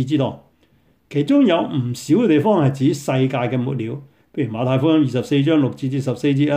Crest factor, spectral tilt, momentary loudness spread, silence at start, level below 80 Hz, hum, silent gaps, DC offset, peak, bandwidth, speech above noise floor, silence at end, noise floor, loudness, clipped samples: 14 dB; -7.5 dB/octave; 10 LU; 0 s; -60 dBFS; none; none; under 0.1%; -4 dBFS; 15.5 kHz; 40 dB; 0 s; -58 dBFS; -19 LUFS; under 0.1%